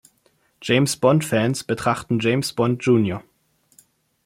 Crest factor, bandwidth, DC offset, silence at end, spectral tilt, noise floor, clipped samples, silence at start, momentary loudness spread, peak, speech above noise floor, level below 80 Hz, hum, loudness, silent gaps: 18 dB; 16.5 kHz; under 0.1%; 1.05 s; -5.5 dB/octave; -63 dBFS; under 0.1%; 0.6 s; 6 LU; -4 dBFS; 44 dB; -58 dBFS; none; -20 LUFS; none